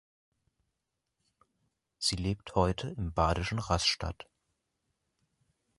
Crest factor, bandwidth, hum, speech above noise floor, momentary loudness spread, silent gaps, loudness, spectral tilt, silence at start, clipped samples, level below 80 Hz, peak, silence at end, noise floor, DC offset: 24 dB; 11.5 kHz; none; 54 dB; 8 LU; none; -31 LUFS; -4.5 dB/octave; 2 s; under 0.1%; -46 dBFS; -12 dBFS; 1.55 s; -85 dBFS; under 0.1%